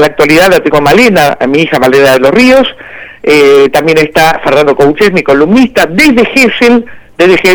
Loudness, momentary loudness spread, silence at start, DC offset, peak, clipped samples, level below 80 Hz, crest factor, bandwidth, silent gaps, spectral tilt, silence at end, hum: -5 LUFS; 5 LU; 0 s; under 0.1%; 0 dBFS; 3%; -34 dBFS; 6 dB; over 20 kHz; none; -4.5 dB/octave; 0 s; none